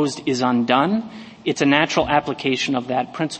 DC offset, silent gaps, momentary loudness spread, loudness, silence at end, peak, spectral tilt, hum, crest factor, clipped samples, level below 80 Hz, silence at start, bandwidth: under 0.1%; none; 8 LU; -20 LUFS; 0 s; 0 dBFS; -4.5 dB/octave; none; 20 dB; under 0.1%; -52 dBFS; 0 s; 8.8 kHz